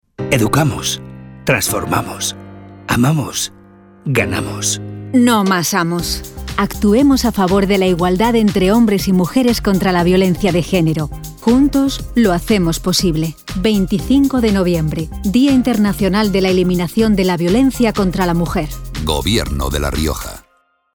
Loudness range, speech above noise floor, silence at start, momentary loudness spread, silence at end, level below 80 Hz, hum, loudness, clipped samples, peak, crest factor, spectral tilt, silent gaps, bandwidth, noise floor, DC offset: 4 LU; 28 dB; 0.2 s; 9 LU; 0.55 s; -30 dBFS; none; -15 LUFS; under 0.1%; -2 dBFS; 14 dB; -5 dB/octave; none; over 20 kHz; -42 dBFS; under 0.1%